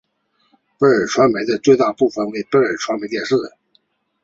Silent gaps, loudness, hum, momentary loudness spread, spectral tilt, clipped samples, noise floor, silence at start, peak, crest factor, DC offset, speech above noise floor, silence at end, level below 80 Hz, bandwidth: none; -17 LUFS; none; 8 LU; -5 dB/octave; under 0.1%; -65 dBFS; 0.8 s; 0 dBFS; 18 dB; under 0.1%; 48 dB; 0.75 s; -60 dBFS; 7.8 kHz